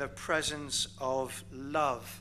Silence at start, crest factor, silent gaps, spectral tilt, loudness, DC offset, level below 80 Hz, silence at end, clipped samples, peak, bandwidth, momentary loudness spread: 0 s; 18 dB; none; -2.5 dB/octave; -33 LUFS; 0.1%; -58 dBFS; 0 s; under 0.1%; -16 dBFS; 15.5 kHz; 5 LU